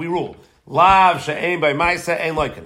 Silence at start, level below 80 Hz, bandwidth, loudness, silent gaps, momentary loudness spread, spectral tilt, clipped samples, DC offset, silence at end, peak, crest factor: 0 s; -42 dBFS; 16 kHz; -17 LUFS; none; 12 LU; -4.5 dB/octave; under 0.1%; under 0.1%; 0 s; 0 dBFS; 18 dB